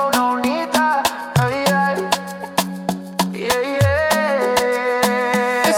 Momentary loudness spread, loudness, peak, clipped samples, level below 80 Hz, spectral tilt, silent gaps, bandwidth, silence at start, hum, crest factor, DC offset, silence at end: 6 LU; -18 LUFS; -2 dBFS; under 0.1%; -50 dBFS; -4.5 dB/octave; none; 18 kHz; 0 s; none; 16 dB; under 0.1%; 0 s